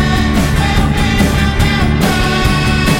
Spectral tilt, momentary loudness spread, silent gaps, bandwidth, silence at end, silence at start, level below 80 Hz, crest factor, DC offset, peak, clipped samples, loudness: -5.5 dB/octave; 1 LU; none; 17.5 kHz; 0 s; 0 s; -18 dBFS; 12 dB; under 0.1%; 0 dBFS; under 0.1%; -12 LUFS